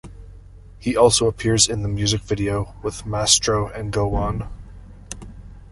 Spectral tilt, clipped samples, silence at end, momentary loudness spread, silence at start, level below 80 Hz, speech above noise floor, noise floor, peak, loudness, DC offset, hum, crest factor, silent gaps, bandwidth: -3.5 dB/octave; under 0.1%; 0 s; 21 LU; 0.05 s; -36 dBFS; 22 dB; -42 dBFS; -2 dBFS; -20 LUFS; under 0.1%; none; 20 dB; none; 11.5 kHz